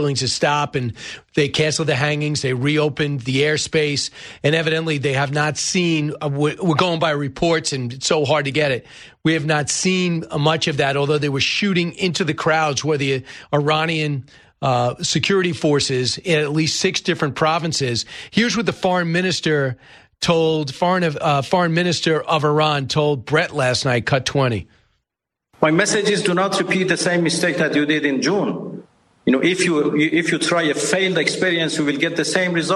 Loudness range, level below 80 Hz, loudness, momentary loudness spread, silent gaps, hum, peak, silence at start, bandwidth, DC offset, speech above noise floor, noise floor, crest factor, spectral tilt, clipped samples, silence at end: 2 LU; -54 dBFS; -19 LUFS; 5 LU; none; none; 0 dBFS; 0 s; 12 kHz; under 0.1%; 64 dB; -83 dBFS; 18 dB; -4.5 dB/octave; under 0.1%; 0 s